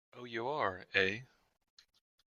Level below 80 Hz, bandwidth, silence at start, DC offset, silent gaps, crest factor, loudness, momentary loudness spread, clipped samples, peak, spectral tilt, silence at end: -76 dBFS; 7.2 kHz; 0.15 s; under 0.1%; none; 28 dB; -35 LUFS; 12 LU; under 0.1%; -12 dBFS; -4.5 dB/octave; 1 s